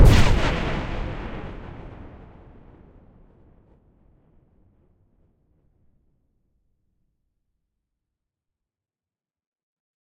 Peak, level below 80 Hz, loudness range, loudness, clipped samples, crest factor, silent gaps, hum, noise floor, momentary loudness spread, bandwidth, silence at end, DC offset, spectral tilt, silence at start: -2 dBFS; -30 dBFS; 27 LU; -24 LUFS; under 0.1%; 24 dB; none; none; under -90 dBFS; 27 LU; 15.5 kHz; 8.1 s; under 0.1%; -6 dB/octave; 0 s